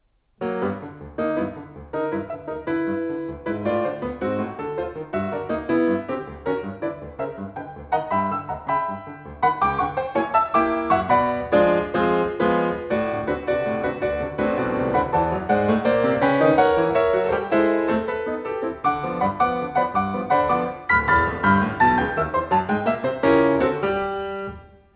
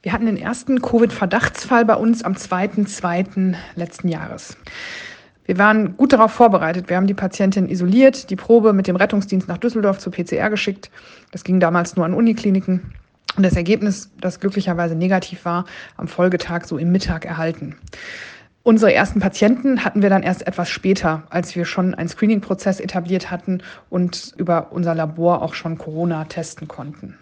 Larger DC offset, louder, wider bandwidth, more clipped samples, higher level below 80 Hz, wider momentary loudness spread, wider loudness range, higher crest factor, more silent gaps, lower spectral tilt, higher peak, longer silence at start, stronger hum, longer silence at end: neither; second, -22 LUFS vs -18 LUFS; second, 4 kHz vs 9.2 kHz; neither; about the same, -44 dBFS vs -44 dBFS; second, 11 LU vs 17 LU; about the same, 7 LU vs 6 LU; about the same, 18 dB vs 18 dB; neither; first, -10.5 dB/octave vs -6.5 dB/octave; second, -4 dBFS vs 0 dBFS; first, 0.4 s vs 0.05 s; neither; first, 0.3 s vs 0.1 s